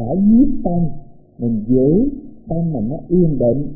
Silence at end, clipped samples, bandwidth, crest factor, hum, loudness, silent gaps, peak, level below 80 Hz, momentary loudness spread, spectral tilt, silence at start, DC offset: 0 s; under 0.1%; 0.9 kHz; 12 dB; none; -17 LUFS; none; -4 dBFS; -34 dBFS; 11 LU; -19.5 dB/octave; 0 s; under 0.1%